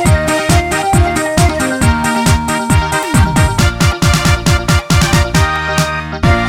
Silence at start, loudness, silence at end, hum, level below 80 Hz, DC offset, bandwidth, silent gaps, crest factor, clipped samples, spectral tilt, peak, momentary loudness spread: 0 s; -12 LUFS; 0 s; none; -20 dBFS; under 0.1%; 17 kHz; none; 12 dB; under 0.1%; -4.5 dB/octave; 0 dBFS; 2 LU